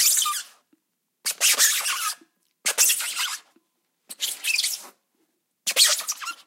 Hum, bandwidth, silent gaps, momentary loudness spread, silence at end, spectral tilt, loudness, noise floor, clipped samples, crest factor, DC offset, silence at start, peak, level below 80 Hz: none; 16.5 kHz; none; 13 LU; 0.1 s; 5 dB/octave; -21 LUFS; -74 dBFS; under 0.1%; 24 dB; under 0.1%; 0 s; -2 dBFS; under -90 dBFS